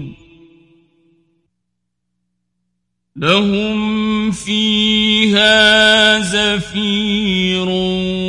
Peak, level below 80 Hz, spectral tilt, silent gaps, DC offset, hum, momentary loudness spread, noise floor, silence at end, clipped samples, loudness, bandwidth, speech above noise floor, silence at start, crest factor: 0 dBFS; -44 dBFS; -4 dB/octave; none; under 0.1%; 60 Hz at -50 dBFS; 9 LU; -74 dBFS; 0 s; under 0.1%; -13 LUFS; 11.5 kHz; 60 dB; 0 s; 16 dB